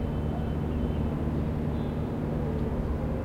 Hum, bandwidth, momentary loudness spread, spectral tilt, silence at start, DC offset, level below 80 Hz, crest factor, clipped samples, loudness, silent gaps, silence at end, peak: none; 8.4 kHz; 1 LU; -9.5 dB/octave; 0 s; under 0.1%; -36 dBFS; 14 dB; under 0.1%; -30 LUFS; none; 0 s; -16 dBFS